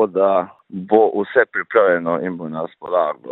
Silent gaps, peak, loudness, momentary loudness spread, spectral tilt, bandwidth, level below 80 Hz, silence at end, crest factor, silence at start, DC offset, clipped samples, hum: none; 0 dBFS; -18 LUFS; 12 LU; -10 dB/octave; 4.1 kHz; -68 dBFS; 0 s; 18 dB; 0 s; under 0.1%; under 0.1%; none